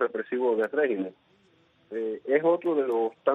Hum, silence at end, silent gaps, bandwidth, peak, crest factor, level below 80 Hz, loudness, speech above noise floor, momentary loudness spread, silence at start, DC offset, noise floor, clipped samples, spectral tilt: none; 0 s; none; 4 kHz; -10 dBFS; 16 dB; -78 dBFS; -27 LUFS; 37 dB; 10 LU; 0 s; under 0.1%; -63 dBFS; under 0.1%; -7.5 dB/octave